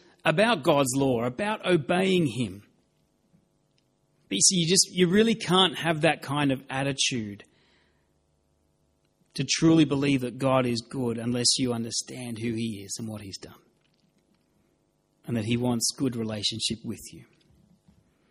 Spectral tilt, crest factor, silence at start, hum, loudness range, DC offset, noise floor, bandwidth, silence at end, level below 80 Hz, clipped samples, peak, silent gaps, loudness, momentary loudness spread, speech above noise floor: -3.5 dB/octave; 22 dB; 0.25 s; none; 9 LU; under 0.1%; -70 dBFS; 15 kHz; 1.1 s; -60 dBFS; under 0.1%; -6 dBFS; none; -25 LUFS; 14 LU; 45 dB